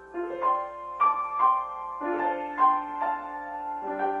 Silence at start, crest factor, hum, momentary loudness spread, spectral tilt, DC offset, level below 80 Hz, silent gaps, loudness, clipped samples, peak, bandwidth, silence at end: 0 s; 16 dB; none; 11 LU; -6 dB/octave; under 0.1%; -64 dBFS; none; -27 LUFS; under 0.1%; -10 dBFS; 4.6 kHz; 0 s